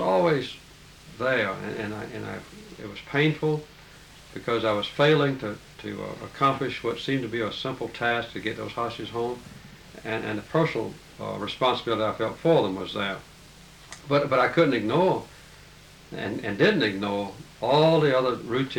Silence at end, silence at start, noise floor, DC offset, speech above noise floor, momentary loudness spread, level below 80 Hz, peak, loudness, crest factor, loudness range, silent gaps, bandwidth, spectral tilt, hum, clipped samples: 0 s; 0 s; -49 dBFS; under 0.1%; 24 dB; 18 LU; -56 dBFS; -8 dBFS; -26 LUFS; 18 dB; 5 LU; none; 19 kHz; -6 dB/octave; none; under 0.1%